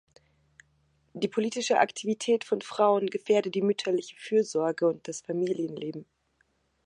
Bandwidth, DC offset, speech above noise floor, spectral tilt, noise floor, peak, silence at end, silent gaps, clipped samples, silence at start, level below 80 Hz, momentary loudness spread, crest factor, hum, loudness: 11 kHz; under 0.1%; 44 dB; -4.5 dB/octave; -72 dBFS; -8 dBFS; 0.85 s; none; under 0.1%; 1.15 s; -78 dBFS; 9 LU; 22 dB; none; -28 LUFS